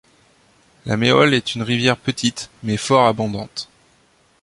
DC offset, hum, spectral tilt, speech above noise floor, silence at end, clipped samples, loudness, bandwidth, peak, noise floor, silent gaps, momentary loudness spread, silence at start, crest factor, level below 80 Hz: under 0.1%; none; -4.5 dB/octave; 39 dB; 0.8 s; under 0.1%; -18 LUFS; 11.5 kHz; -2 dBFS; -57 dBFS; none; 16 LU; 0.85 s; 18 dB; -52 dBFS